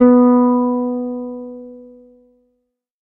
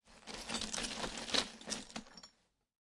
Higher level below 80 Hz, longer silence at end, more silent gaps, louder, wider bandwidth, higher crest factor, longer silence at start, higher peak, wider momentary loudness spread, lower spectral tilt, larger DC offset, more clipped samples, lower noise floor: about the same, -58 dBFS vs -62 dBFS; first, 1.2 s vs 0.65 s; neither; first, -15 LUFS vs -40 LUFS; second, 2.4 kHz vs 11.5 kHz; second, 16 dB vs 26 dB; about the same, 0 s vs 0.05 s; first, 0 dBFS vs -18 dBFS; first, 23 LU vs 19 LU; first, -11.5 dB/octave vs -1 dB/octave; neither; neither; about the same, -71 dBFS vs -72 dBFS